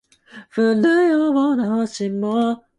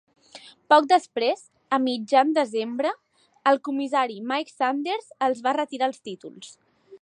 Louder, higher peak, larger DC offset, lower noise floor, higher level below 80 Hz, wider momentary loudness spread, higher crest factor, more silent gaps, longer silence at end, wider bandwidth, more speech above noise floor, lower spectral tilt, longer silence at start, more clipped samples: first, -18 LUFS vs -24 LUFS; about the same, -6 dBFS vs -4 dBFS; neither; second, -44 dBFS vs -49 dBFS; first, -66 dBFS vs -82 dBFS; second, 8 LU vs 18 LU; second, 12 dB vs 20 dB; neither; first, 0.2 s vs 0.05 s; about the same, 11 kHz vs 10 kHz; about the same, 26 dB vs 25 dB; first, -6 dB/octave vs -3.5 dB/octave; about the same, 0.35 s vs 0.35 s; neither